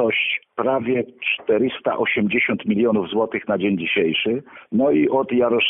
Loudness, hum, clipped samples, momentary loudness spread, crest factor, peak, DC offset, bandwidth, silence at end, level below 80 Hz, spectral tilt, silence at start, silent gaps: -20 LUFS; none; under 0.1%; 4 LU; 14 dB; -6 dBFS; under 0.1%; 3.9 kHz; 0 s; -60 dBFS; -10 dB/octave; 0 s; none